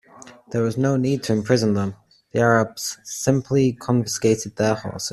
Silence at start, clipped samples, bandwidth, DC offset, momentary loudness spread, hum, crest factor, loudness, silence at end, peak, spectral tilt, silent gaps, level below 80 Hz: 0.15 s; under 0.1%; 14 kHz; under 0.1%; 9 LU; none; 20 dB; -21 LUFS; 0 s; -2 dBFS; -5.5 dB/octave; none; -56 dBFS